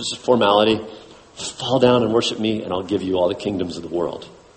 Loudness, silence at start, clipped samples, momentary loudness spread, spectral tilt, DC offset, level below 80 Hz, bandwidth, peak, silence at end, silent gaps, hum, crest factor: -20 LUFS; 0 s; under 0.1%; 12 LU; -5 dB/octave; under 0.1%; -54 dBFS; 8.8 kHz; -2 dBFS; 0.25 s; none; none; 18 dB